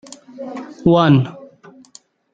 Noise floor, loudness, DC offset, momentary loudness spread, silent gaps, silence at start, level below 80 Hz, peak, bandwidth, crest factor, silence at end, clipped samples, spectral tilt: -49 dBFS; -15 LUFS; under 0.1%; 21 LU; none; 0.4 s; -50 dBFS; -2 dBFS; 9 kHz; 18 dB; 0.95 s; under 0.1%; -7.5 dB/octave